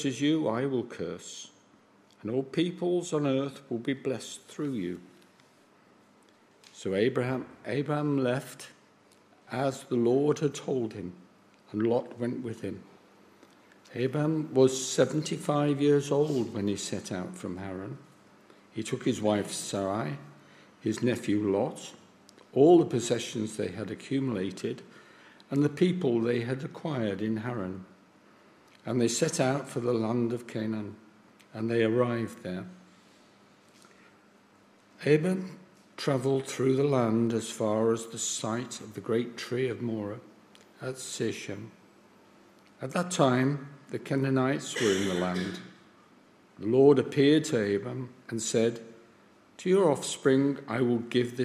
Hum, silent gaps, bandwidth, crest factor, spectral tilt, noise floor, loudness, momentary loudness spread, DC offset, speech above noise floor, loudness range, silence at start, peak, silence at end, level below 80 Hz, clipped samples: none; none; 15 kHz; 22 dB; -5.5 dB/octave; -61 dBFS; -29 LUFS; 15 LU; under 0.1%; 32 dB; 7 LU; 0 s; -8 dBFS; 0 s; -74 dBFS; under 0.1%